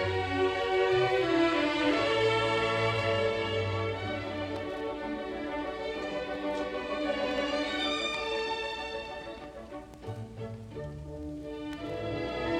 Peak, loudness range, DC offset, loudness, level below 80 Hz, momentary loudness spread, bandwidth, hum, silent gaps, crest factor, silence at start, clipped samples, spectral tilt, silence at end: -16 dBFS; 12 LU; under 0.1%; -31 LUFS; -54 dBFS; 15 LU; 12 kHz; none; none; 16 dB; 0 s; under 0.1%; -5.5 dB/octave; 0 s